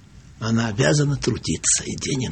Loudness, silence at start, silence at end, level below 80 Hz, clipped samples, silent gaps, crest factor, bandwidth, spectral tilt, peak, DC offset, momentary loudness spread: -21 LUFS; 0.15 s; 0 s; -44 dBFS; under 0.1%; none; 18 dB; 9 kHz; -4 dB/octave; -4 dBFS; under 0.1%; 6 LU